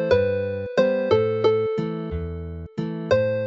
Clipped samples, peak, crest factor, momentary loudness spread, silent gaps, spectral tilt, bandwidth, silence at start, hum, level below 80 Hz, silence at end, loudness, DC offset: under 0.1%; -6 dBFS; 18 dB; 11 LU; none; -7.5 dB/octave; 7.2 kHz; 0 s; none; -42 dBFS; 0 s; -23 LUFS; under 0.1%